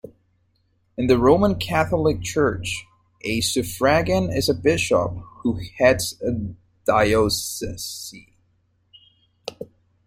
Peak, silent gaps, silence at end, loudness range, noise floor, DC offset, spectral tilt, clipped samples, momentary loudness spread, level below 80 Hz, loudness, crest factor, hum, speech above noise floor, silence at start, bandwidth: -2 dBFS; none; 0.45 s; 4 LU; -66 dBFS; under 0.1%; -4.5 dB/octave; under 0.1%; 17 LU; -44 dBFS; -21 LUFS; 20 dB; none; 45 dB; 1 s; 16.5 kHz